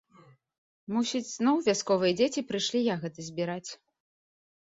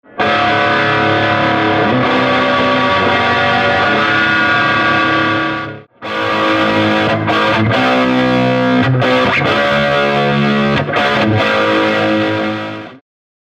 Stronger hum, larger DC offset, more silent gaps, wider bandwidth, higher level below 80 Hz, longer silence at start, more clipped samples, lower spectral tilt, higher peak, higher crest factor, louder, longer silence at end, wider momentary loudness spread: neither; neither; neither; second, 8 kHz vs 13 kHz; second, -72 dBFS vs -44 dBFS; first, 0.9 s vs 0.15 s; neither; second, -4 dB/octave vs -6 dB/octave; second, -12 dBFS vs -4 dBFS; first, 18 dB vs 10 dB; second, -29 LUFS vs -12 LUFS; first, 0.95 s vs 0.55 s; first, 11 LU vs 5 LU